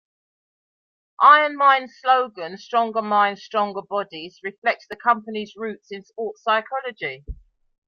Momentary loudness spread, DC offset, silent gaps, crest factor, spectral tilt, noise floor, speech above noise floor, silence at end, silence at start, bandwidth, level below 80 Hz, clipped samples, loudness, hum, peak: 19 LU; under 0.1%; 4.58-4.62 s; 20 dB; -4.5 dB/octave; under -90 dBFS; over 69 dB; 0.55 s; 1.2 s; 6.8 kHz; -50 dBFS; under 0.1%; -20 LUFS; none; -2 dBFS